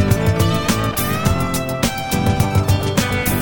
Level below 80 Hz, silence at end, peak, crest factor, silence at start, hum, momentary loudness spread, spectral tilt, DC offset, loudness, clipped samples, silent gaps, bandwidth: -30 dBFS; 0 s; -2 dBFS; 16 dB; 0 s; none; 3 LU; -5 dB/octave; under 0.1%; -18 LUFS; under 0.1%; none; 17.5 kHz